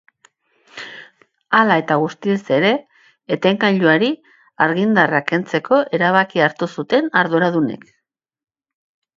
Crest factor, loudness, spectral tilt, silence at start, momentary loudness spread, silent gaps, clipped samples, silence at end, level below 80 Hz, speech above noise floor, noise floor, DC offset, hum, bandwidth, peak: 18 dB; -17 LUFS; -6.5 dB/octave; 0.75 s; 11 LU; none; under 0.1%; 1.4 s; -66 dBFS; 56 dB; -72 dBFS; under 0.1%; none; 7.6 kHz; 0 dBFS